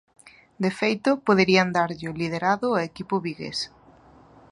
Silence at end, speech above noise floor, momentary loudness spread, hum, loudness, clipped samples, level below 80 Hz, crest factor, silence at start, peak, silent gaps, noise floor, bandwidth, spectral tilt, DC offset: 0.85 s; 29 dB; 11 LU; none; -24 LUFS; under 0.1%; -60 dBFS; 20 dB; 0.25 s; -4 dBFS; none; -52 dBFS; 11 kHz; -5.5 dB/octave; under 0.1%